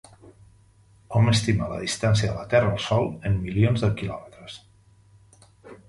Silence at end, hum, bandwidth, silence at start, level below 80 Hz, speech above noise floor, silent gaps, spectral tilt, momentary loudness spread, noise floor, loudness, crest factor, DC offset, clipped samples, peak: 0.15 s; none; 11.5 kHz; 0.25 s; -44 dBFS; 34 dB; none; -6 dB/octave; 19 LU; -56 dBFS; -24 LUFS; 18 dB; under 0.1%; under 0.1%; -8 dBFS